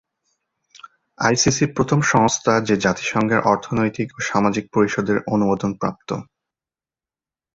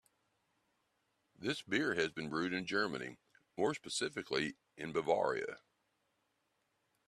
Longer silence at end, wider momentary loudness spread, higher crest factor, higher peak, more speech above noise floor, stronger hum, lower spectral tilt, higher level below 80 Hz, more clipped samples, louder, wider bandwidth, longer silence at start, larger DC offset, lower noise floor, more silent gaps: second, 1.35 s vs 1.5 s; second, 8 LU vs 12 LU; about the same, 18 dB vs 22 dB; first, -2 dBFS vs -18 dBFS; first, over 71 dB vs 44 dB; neither; about the same, -4.5 dB/octave vs -4 dB/octave; first, -50 dBFS vs -76 dBFS; neither; first, -19 LUFS vs -38 LUFS; second, 8 kHz vs 13 kHz; second, 0.85 s vs 1.4 s; neither; first, under -90 dBFS vs -81 dBFS; neither